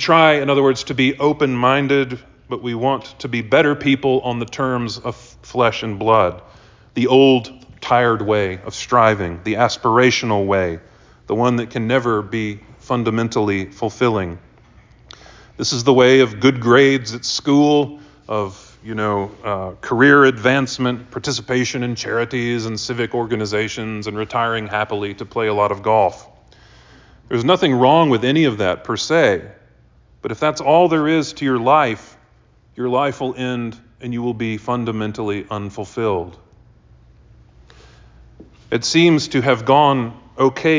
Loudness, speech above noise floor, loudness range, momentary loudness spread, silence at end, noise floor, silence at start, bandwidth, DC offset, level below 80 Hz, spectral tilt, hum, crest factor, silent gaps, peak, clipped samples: -17 LUFS; 36 dB; 7 LU; 13 LU; 0 s; -52 dBFS; 0 s; 7.6 kHz; under 0.1%; -48 dBFS; -5.5 dB/octave; none; 16 dB; none; -2 dBFS; under 0.1%